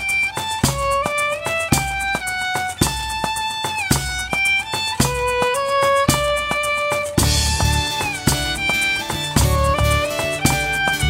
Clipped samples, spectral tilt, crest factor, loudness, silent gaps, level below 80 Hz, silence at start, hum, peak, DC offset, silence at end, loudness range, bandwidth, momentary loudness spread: under 0.1%; -3.5 dB/octave; 18 dB; -19 LUFS; none; -30 dBFS; 0 s; none; -2 dBFS; under 0.1%; 0 s; 2 LU; 16.5 kHz; 5 LU